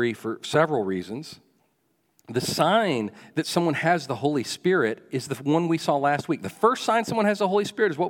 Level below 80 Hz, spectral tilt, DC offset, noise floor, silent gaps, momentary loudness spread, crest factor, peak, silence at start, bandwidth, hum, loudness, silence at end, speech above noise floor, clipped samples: -70 dBFS; -5 dB/octave; under 0.1%; -70 dBFS; none; 9 LU; 20 dB; -4 dBFS; 0 s; 18 kHz; none; -24 LUFS; 0 s; 46 dB; under 0.1%